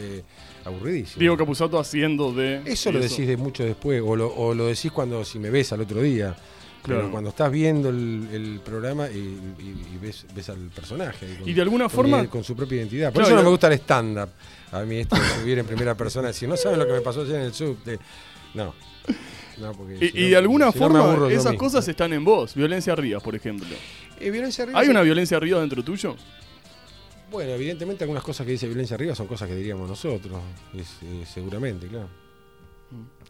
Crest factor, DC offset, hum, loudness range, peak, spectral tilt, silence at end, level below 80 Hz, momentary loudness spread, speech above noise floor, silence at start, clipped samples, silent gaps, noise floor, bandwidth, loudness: 20 dB; 0.1%; none; 11 LU; -4 dBFS; -6 dB/octave; 0.2 s; -48 dBFS; 19 LU; 29 dB; 0 s; under 0.1%; none; -52 dBFS; 15.5 kHz; -23 LUFS